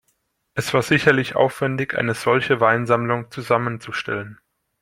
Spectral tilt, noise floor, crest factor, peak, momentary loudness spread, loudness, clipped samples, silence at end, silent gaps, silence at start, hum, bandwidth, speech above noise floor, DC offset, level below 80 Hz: -5.5 dB/octave; -69 dBFS; 20 dB; -2 dBFS; 11 LU; -20 LUFS; under 0.1%; 0.45 s; none; 0.55 s; none; 16.5 kHz; 49 dB; under 0.1%; -58 dBFS